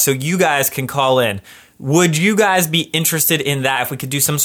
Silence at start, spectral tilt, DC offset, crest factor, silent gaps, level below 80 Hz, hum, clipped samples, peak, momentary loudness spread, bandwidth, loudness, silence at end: 0 s; -3.5 dB/octave; under 0.1%; 14 dB; none; -56 dBFS; none; under 0.1%; -2 dBFS; 6 LU; over 20 kHz; -15 LUFS; 0 s